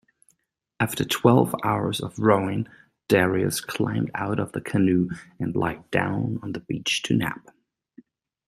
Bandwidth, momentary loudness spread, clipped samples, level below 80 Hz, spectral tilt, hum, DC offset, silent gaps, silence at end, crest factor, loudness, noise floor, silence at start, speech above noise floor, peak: 16 kHz; 10 LU; under 0.1%; -56 dBFS; -5.5 dB/octave; none; under 0.1%; none; 1.1 s; 22 dB; -24 LUFS; -71 dBFS; 0.8 s; 48 dB; -2 dBFS